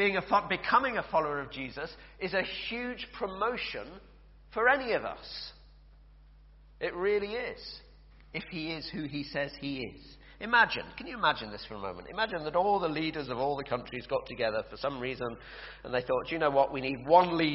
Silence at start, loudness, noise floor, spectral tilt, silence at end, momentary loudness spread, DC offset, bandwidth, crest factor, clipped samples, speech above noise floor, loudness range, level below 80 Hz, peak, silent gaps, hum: 0 s; -31 LUFS; -56 dBFS; -2 dB/octave; 0 s; 15 LU; under 0.1%; 5.8 kHz; 22 dB; under 0.1%; 24 dB; 6 LU; -56 dBFS; -10 dBFS; none; none